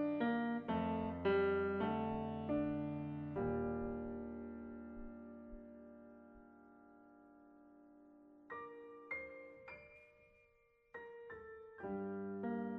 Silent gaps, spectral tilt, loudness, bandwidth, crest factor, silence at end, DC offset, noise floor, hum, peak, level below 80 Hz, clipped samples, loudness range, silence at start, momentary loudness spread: none; -6 dB/octave; -42 LUFS; 5 kHz; 18 dB; 0 s; under 0.1%; -73 dBFS; none; -26 dBFS; -64 dBFS; under 0.1%; 19 LU; 0 s; 23 LU